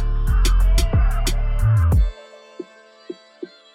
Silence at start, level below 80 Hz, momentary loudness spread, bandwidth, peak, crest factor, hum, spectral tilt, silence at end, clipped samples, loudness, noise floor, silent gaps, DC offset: 0 s; -20 dBFS; 21 LU; 15 kHz; -6 dBFS; 12 dB; none; -5.5 dB/octave; 0.3 s; under 0.1%; -20 LUFS; -41 dBFS; none; under 0.1%